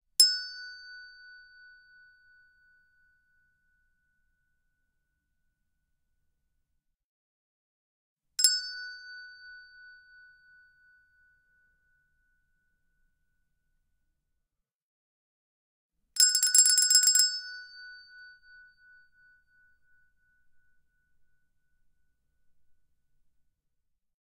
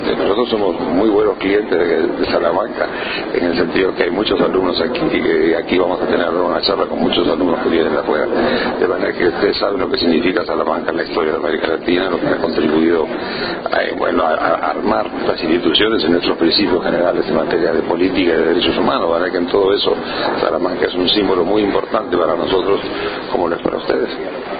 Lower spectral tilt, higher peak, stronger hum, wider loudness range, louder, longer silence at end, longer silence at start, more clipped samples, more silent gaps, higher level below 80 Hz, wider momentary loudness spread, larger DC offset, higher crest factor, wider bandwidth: second, 7.5 dB/octave vs -9.5 dB/octave; second, -4 dBFS vs 0 dBFS; neither; first, 18 LU vs 2 LU; second, -22 LUFS vs -16 LUFS; first, 6.3 s vs 0 s; first, 0.2 s vs 0 s; neither; first, 7.04-8.16 s, 14.74-15.90 s vs none; second, -78 dBFS vs -42 dBFS; first, 28 LU vs 4 LU; neither; first, 32 dB vs 16 dB; first, 15.5 kHz vs 5 kHz